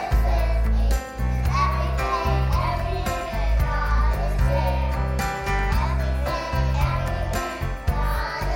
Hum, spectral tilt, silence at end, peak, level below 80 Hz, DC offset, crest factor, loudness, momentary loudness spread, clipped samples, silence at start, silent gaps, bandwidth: none; -6 dB/octave; 0 s; -10 dBFS; -24 dBFS; under 0.1%; 12 dB; -24 LUFS; 4 LU; under 0.1%; 0 s; none; 16.5 kHz